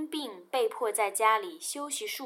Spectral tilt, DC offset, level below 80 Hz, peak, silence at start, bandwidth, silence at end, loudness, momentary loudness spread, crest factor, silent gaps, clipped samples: 0 dB/octave; under 0.1%; under -90 dBFS; -12 dBFS; 0 s; 16.5 kHz; 0 s; -30 LUFS; 10 LU; 18 dB; none; under 0.1%